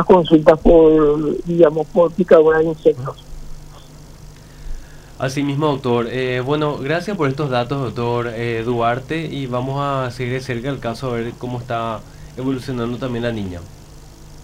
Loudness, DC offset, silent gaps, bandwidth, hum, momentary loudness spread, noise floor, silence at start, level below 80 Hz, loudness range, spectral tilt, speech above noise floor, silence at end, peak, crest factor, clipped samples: -18 LUFS; under 0.1%; none; 14 kHz; 50 Hz at -40 dBFS; 15 LU; -39 dBFS; 0 s; -36 dBFS; 10 LU; -7 dB/octave; 22 dB; 0 s; 0 dBFS; 18 dB; under 0.1%